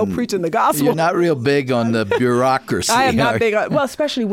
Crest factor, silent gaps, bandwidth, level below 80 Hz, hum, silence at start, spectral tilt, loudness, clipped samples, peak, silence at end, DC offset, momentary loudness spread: 10 dB; none; 17 kHz; -50 dBFS; none; 0 s; -5 dB/octave; -17 LUFS; under 0.1%; -6 dBFS; 0 s; under 0.1%; 4 LU